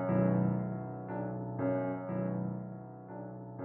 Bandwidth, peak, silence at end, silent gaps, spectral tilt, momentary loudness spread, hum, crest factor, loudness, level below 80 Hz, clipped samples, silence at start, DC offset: 3.1 kHz; -18 dBFS; 0 s; none; -11 dB/octave; 15 LU; none; 16 dB; -36 LUFS; -66 dBFS; under 0.1%; 0 s; under 0.1%